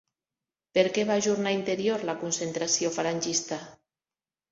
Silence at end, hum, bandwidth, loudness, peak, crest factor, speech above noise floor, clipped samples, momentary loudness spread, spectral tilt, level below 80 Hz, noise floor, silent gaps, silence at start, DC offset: 0.8 s; none; 8.2 kHz; -27 LUFS; -10 dBFS; 18 dB; over 63 dB; under 0.1%; 5 LU; -3 dB/octave; -72 dBFS; under -90 dBFS; none; 0.75 s; under 0.1%